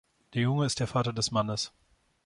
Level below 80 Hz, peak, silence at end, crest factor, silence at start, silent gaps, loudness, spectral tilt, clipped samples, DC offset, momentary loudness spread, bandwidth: -58 dBFS; -14 dBFS; 0.6 s; 18 dB; 0.3 s; none; -30 LUFS; -5 dB/octave; under 0.1%; under 0.1%; 8 LU; 11 kHz